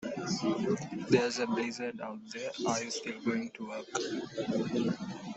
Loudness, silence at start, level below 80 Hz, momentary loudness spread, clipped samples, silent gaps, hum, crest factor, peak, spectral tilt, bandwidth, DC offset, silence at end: -34 LUFS; 0 s; -72 dBFS; 11 LU; under 0.1%; none; none; 22 dB; -12 dBFS; -4.5 dB/octave; 8.2 kHz; under 0.1%; 0 s